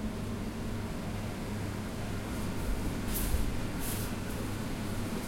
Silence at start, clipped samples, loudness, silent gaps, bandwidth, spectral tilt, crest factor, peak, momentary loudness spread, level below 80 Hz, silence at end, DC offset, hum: 0 s; under 0.1%; -36 LUFS; none; 16.5 kHz; -5 dB/octave; 16 dB; -18 dBFS; 4 LU; -40 dBFS; 0 s; under 0.1%; none